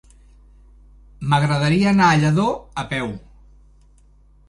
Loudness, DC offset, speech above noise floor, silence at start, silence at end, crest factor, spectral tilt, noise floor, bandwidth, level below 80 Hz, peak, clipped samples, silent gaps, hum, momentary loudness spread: -19 LUFS; under 0.1%; 34 dB; 1.2 s; 1.3 s; 18 dB; -6 dB/octave; -51 dBFS; 11.5 kHz; -46 dBFS; -4 dBFS; under 0.1%; none; 50 Hz at -35 dBFS; 15 LU